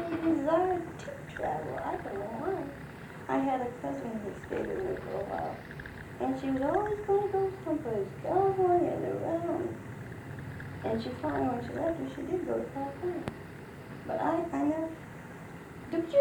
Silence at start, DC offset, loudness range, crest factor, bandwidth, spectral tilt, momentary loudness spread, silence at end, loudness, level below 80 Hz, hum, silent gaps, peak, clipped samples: 0 s; under 0.1%; 5 LU; 18 dB; 20 kHz; -7.5 dB/octave; 15 LU; 0 s; -33 LUFS; -58 dBFS; none; none; -14 dBFS; under 0.1%